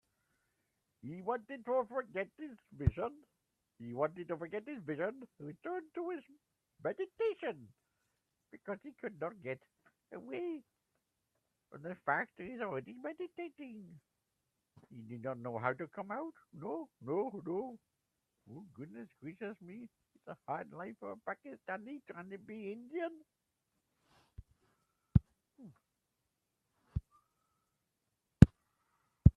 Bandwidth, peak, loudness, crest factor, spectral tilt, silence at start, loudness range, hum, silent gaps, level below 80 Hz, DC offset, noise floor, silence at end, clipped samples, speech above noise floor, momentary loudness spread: 11 kHz; -4 dBFS; -39 LUFS; 36 dB; -9.5 dB/octave; 1.05 s; 7 LU; none; none; -52 dBFS; under 0.1%; -86 dBFS; 0.05 s; under 0.1%; 44 dB; 17 LU